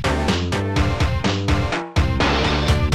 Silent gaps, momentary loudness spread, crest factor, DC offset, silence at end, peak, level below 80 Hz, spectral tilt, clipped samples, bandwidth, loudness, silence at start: none; 3 LU; 14 dB; 0.8%; 0 s; -4 dBFS; -26 dBFS; -5.5 dB/octave; under 0.1%; 13 kHz; -20 LUFS; 0 s